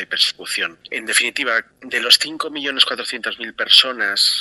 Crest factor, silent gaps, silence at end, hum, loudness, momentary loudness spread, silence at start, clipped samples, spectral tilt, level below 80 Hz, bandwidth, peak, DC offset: 20 dB; none; 0 s; none; -16 LUFS; 13 LU; 0 s; under 0.1%; 1 dB/octave; -66 dBFS; 13 kHz; 0 dBFS; under 0.1%